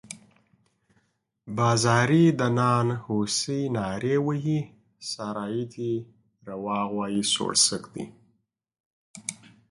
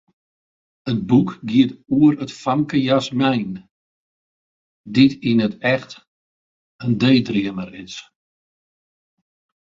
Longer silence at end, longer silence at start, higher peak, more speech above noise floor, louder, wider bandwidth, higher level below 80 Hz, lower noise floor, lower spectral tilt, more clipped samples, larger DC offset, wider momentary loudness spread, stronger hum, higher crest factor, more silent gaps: second, 0.35 s vs 1.6 s; second, 0.05 s vs 0.85 s; second, -6 dBFS vs -2 dBFS; second, 46 dB vs over 72 dB; second, -25 LUFS vs -19 LUFS; first, 11.5 kHz vs 7.6 kHz; about the same, -62 dBFS vs -58 dBFS; second, -71 dBFS vs under -90 dBFS; second, -4.5 dB/octave vs -7 dB/octave; neither; neither; about the same, 18 LU vs 16 LU; neither; about the same, 20 dB vs 20 dB; second, 8.80-9.14 s vs 3.71-4.84 s, 6.07-6.79 s